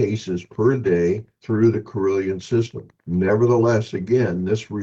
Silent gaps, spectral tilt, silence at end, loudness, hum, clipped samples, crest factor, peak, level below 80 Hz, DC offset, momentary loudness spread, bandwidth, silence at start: none; -8 dB/octave; 0 s; -21 LUFS; none; under 0.1%; 14 dB; -6 dBFS; -54 dBFS; under 0.1%; 9 LU; 7.8 kHz; 0 s